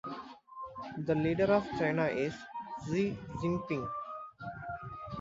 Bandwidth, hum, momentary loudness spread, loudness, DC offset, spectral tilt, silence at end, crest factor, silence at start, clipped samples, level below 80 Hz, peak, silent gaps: 7.8 kHz; none; 15 LU; -34 LUFS; under 0.1%; -7.5 dB/octave; 0 s; 20 dB; 0.05 s; under 0.1%; -60 dBFS; -16 dBFS; none